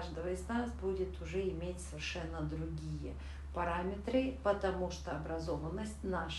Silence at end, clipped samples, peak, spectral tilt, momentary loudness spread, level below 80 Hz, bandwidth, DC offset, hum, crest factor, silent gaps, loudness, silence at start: 0 s; under 0.1%; -20 dBFS; -6 dB/octave; 7 LU; -46 dBFS; 12 kHz; under 0.1%; none; 18 dB; none; -39 LUFS; 0 s